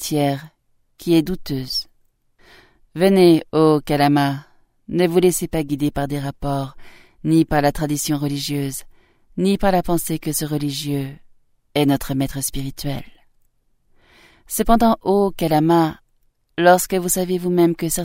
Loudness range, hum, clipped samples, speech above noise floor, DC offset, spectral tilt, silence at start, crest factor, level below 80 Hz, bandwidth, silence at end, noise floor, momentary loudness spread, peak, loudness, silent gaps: 6 LU; none; under 0.1%; 43 dB; under 0.1%; -5.5 dB/octave; 0 s; 20 dB; -40 dBFS; 16.5 kHz; 0 s; -61 dBFS; 12 LU; 0 dBFS; -19 LUFS; none